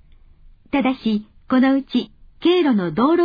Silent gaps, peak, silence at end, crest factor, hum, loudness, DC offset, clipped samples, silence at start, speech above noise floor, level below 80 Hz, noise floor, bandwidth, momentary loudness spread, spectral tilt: none; -6 dBFS; 0 s; 14 dB; none; -19 LUFS; under 0.1%; under 0.1%; 0.75 s; 30 dB; -50 dBFS; -47 dBFS; 5 kHz; 8 LU; -8 dB/octave